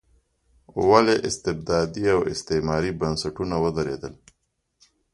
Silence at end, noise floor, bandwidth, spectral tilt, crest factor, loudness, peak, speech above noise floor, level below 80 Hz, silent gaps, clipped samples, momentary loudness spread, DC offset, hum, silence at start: 1 s; -73 dBFS; 11.5 kHz; -5 dB/octave; 22 dB; -23 LUFS; -2 dBFS; 51 dB; -46 dBFS; none; under 0.1%; 11 LU; under 0.1%; none; 0.75 s